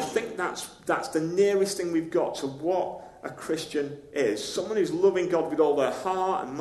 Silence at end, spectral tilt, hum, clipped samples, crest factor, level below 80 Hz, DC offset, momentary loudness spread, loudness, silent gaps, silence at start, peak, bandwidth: 0 s; -4.5 dB/octave; none; under 0.1%; 16 dB; -66 dBFS; under 0.1%; 9 LU; -27 LUFS; none; 0 s; -10 dBFS; 13 kHz